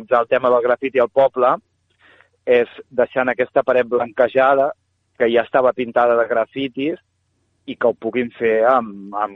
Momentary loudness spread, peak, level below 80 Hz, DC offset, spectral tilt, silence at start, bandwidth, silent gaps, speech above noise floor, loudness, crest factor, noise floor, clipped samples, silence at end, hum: 8 LU; -2 dBFS; -62 dBFS; under 0.1%; -7.5 dB/octave; 0 s; 4.1 kHz; none; 49 dB; -18 LUFS; 16 dB; -66 dBFS; under 0.1%; 0 s; none